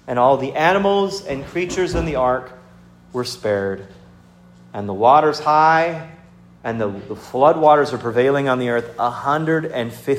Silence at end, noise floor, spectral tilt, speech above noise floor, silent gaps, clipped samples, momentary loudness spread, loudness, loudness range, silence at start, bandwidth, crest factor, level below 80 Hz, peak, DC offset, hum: 0 s; -47 dBFS; -5.5 dB/octave; 29 dB; none; under 0.1%; 14 LU; -18 LUFS; 6 LU; 0.05 s; 15.5 kHz; 18 dB; -44 dBFS; 0 dBFS; under 0.1%; 60 Hz at -55 dBFS